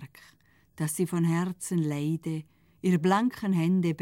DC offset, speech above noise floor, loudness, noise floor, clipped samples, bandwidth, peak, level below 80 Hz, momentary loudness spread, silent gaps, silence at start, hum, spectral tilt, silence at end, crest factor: under 0.1%; 35 dB; -28 LUFS; -62 dBFS; under 0.1%; 16 kHz; -12 dBFS; -68 dBFS; 10 LU; none; 0 s; none; -6.5 dB/octave; 0 s; 16 dB